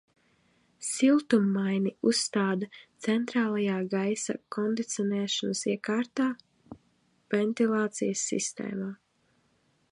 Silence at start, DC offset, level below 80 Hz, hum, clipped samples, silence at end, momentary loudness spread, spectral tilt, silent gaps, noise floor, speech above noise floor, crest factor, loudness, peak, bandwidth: 0.8 s; under 0.1%; -76 dBFS; none; under 0.1%; 0.95 s; 10 LU; -4.5 dB/octave; none; -70 dBFS; 42 dB; 18 dB; -29 LUFS; -10 dBFS; 11.5 kHz